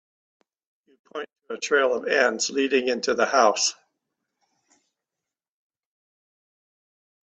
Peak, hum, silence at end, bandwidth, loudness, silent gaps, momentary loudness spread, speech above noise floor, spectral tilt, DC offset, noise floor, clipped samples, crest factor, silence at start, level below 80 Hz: -4 dBFS; none; 3.6 s; 9 kHz; -22 LUFS; none; 17 LU; 65 dB; -1 dB/octave; under 0.1%; -88 dBFS; under 0.1%; 22 dB; 1.15 s; -74 dBFS